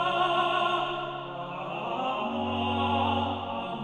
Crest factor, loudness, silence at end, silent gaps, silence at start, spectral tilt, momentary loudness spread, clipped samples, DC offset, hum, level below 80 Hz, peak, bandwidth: 14 dB; -29 LUFS; 0 s; none; 0 s; -6 dB/octave; 10 LU; under 0.1%; under 0.1%; none; -62 dBFS; -14 dBFS; 11 kHz